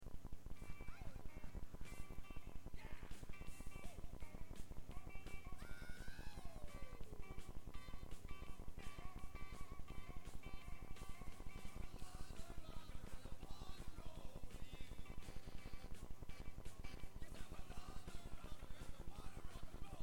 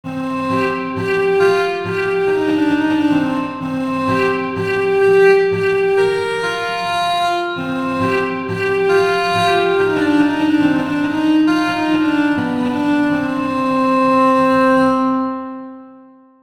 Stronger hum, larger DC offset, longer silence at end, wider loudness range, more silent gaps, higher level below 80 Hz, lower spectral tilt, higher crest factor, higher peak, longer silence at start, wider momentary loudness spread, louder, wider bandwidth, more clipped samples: neither; about the same, 0.4% vs 0.2%; second, 0 s vs 0.45 s; about the same, 0 LU vs 2 LU; neither; about the same, -54 dBFS vs -54 dBFS; about the same, -5 dB/octave vs -6 dB/octave; about the same, 10 dB vs 14 dB; second, -34 dBFS vs -2 dBFS; about the same, 0 s vs 0.05 s; second, 1 LU vs 7 LU; second, -57 LUFS vs -16 LUFS; first, 17 kHz vs 13.5 kHz; neither